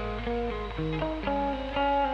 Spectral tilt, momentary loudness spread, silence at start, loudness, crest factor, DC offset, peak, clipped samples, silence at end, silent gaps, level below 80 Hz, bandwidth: -7.5 dB/octave; 5 LU; 0 s; -30 LUFS; 12 dB; under 0.1%; -16 dBFS; under 0.1%; 0 s; none; -40 dBFS; 7.2 kHz